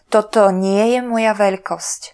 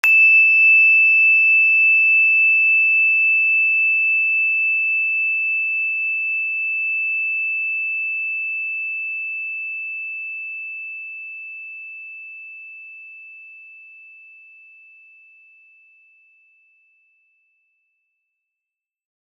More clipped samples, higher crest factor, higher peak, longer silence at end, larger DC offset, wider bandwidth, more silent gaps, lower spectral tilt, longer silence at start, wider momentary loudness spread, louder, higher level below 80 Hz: neither; about the same, 16 dB vs 18 dB; about the same, 0 dBFS vs -2 dBFS; second, 0.05 s vs 5.55 s; neither; second, 11 kHz vs 14 kHz; neither; first, -4.5 dB/octave vs 6.5 dB/octave; about the same, 0.1 s vs 0.05 s; second, 9 LU vs 22 LU; about the same, -16 LUFS vs -14 LUFS; first, -62 dBFS vs under -90 dBFS